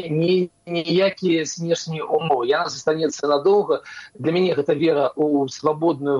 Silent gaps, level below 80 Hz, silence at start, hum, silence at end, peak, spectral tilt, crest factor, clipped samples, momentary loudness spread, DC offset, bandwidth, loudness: none; -66 dBFS; 0 s; none; 0 s; -4 dBFS; -5.5 dB/octave; 16 dB; under 0.1%; 6 LU; under 0.1%; 10.5 kHz; -21 LUFS